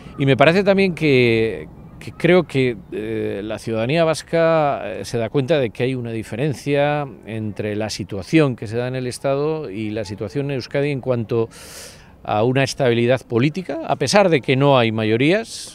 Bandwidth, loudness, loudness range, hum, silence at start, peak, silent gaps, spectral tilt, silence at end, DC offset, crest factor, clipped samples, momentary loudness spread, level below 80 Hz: 14.5 kHz; -19 LUFS; 5 LU; none; 0 s; 0 dBFS; none; -6 dB/octave; 0 s; under 0.1%; 20 dB; under 0.1%; 12 LU; -50 dBFS